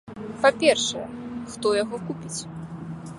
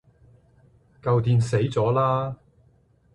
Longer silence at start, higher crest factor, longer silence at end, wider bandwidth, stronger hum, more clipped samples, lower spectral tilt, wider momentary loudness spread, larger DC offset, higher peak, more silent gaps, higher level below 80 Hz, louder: second, 0.05 s vs 1.05 s; first, 22 dB vs 16 dB; second, 0 s vs 0.8 s; about the same, 11.5 kHz vs 11 kHz; neither; neither; second, -3.5 dB/octave vs -7.5 dB/octave; first, 17 LU vs 12 LU; neither; first, -4 dBFS vs -10 dBFS; neither; about the same, -58 dBFS vs -54 dBFS; about the same, -24 LUFS vs -23 LUFS